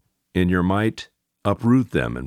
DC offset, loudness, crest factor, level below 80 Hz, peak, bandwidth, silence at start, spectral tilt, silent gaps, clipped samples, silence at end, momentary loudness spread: under 0.1%; -21 LUFS; 16 dB; -44 dBFS; -4 dBFS; 13 kHz; 0.35 s; -7.5 dB/octave; none; under 0.1%; 0 s; 11 LU